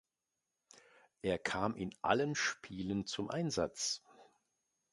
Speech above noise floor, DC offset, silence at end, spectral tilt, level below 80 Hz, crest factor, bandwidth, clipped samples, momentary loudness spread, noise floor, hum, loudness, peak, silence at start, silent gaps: 52 dB; under 0.1%; 0.7 s; -4 dB/octave; -66 dBFS; 24 dB; 11.5 kHz; under 0.1%; 6 LU; -89 dBFS; none; -37 LUFS; -14 dBFS; 1.25 s; none